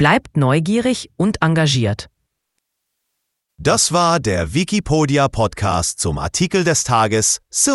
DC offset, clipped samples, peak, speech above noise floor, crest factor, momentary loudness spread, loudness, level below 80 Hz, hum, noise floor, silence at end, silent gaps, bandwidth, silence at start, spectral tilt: under 0.1%; under 0.1%; 0 dBFS; 58 dB; 18 dB; 5 LU; -17 LUFS; -40 dBFS; none; -75 dBFS; 0 s; none; 12 kHz; 0 s; -4 dB/octave